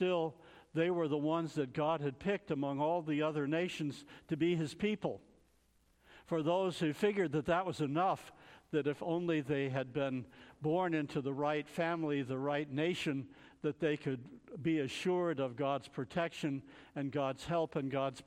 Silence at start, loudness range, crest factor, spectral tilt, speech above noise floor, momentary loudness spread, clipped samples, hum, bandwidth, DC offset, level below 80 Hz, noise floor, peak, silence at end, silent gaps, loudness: 0 s; 2 LU; 18 dB; -6.5 dB/octave; 36 dB; 8 LU; under 0.1%; none; 14 kHz; under 0.1%; -70 dBFS; -71 dBFS; -20 dBFS; 0.05 s; none; -36 LUFS